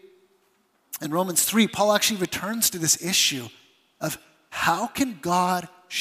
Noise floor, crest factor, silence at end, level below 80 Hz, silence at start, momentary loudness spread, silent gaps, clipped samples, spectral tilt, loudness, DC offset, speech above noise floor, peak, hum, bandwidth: -66 dBFS; 20 dB; 0 s; -62 dBFS; 0.9 s; 14 LU; none; under 0.1%; -2.5 dB/octave; -23 LUFS; under 0.1%; 43 dB; -6 dBFS; none; 15.5 kHz